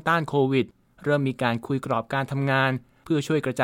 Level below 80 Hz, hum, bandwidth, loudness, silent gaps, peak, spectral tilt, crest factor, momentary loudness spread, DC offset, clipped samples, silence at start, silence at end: -60 dBFS; none; 16 kHz; -25 LUFS; none; -6 dBFS; -6.5 dB/octave; 18 dB; 6 LU; under 0.1%; under 0.1%; 0.05 s; 0 s